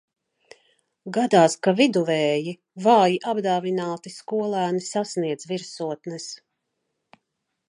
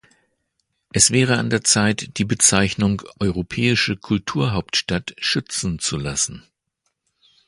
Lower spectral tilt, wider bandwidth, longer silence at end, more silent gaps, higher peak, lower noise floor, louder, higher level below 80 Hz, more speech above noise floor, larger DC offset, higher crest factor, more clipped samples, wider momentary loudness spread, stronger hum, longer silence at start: first, -5 dB/octave vs -3 dB/octave; about the same, 11.5 kHz vs 11.5 kHz; first, 1.3 s vs 1.1 s; neither; second, -4 dBFS vs 0 dBFS; first, -79 dBFS vs -74 dBFS; second, -22 LUFS vs -19 LUFS; second, -76 dBFS vs -44 dBFS; about the same, 57 dB vs 54 dB; neither; about the same, 20 dB vs 22 dB; neither; first, 16 LU vs 9 LU; neither; about the same, 1.05 s vs 0.95 s